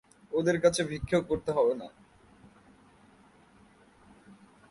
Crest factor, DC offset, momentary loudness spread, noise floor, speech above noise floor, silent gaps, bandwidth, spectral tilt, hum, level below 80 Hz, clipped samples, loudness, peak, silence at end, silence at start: 22 dB; under 0.1%; 10 LU; -59 dBFS; 32 dB; none; 11.5 kHz; -5 dB/octave; none; -56 dBFS; under 0.1%; -29 LUFS; -10 dBFS; 0.35 s; 0.3 s